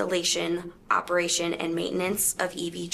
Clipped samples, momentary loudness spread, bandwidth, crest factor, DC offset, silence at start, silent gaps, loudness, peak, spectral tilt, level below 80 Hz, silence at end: under 0.1%; 6 LU; 15 kHz; 18 dB; under 0.1%; 0 s; none; -26 LUFS; -10 dBFS; -2.5 dB/octave; -58 dBFS; 0 s